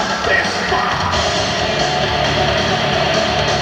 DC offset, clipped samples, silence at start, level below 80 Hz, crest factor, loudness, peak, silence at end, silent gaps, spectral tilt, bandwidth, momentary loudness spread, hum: under 0.1%; under 0.1%; 0 s; -34 dBFS; 14 dB; -15 LUFS; -2 dBFS; 0 s; none; -3.5 dB/octave; 16.5 kHz; 1 LU; none